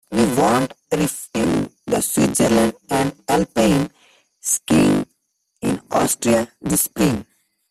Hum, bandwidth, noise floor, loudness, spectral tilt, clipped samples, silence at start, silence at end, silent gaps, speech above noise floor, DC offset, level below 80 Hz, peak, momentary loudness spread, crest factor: none; 16 kHz; -70 dBFS; -19 LUFS; -4.5 dB/octave; under 0.1%; 0.1 s; 0.5 s; none; 52 dB; under 0.1%; -46 dBFS; -4 dBFS; 8 LU; 16 dB